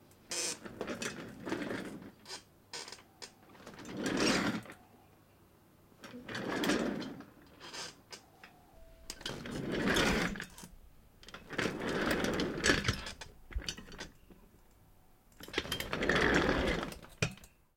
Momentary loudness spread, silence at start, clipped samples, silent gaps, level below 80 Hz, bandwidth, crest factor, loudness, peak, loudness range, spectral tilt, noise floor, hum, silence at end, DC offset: 22 LU; 0.3 s; under 0.1%; none; -52 dBFS; 16.5 kHz; 26 dB; -35 LUFS; -12 dBFS; 7 LU; -3.5 dB/octave; -63 dBFS; none; 0.3 s; under 0.1%